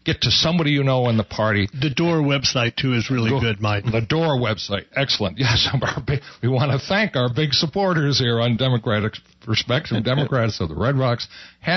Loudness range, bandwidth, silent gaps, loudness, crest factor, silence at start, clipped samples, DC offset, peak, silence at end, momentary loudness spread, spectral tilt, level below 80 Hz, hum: 1 LU; 6.4 kHz; none; -20 LUFS; 14 dB; 0.05 s; under 0.1%; under 0.1%; -6 dBFS; 0 s; 6 LU; -5.5 dB/octave; -46 dBFS; none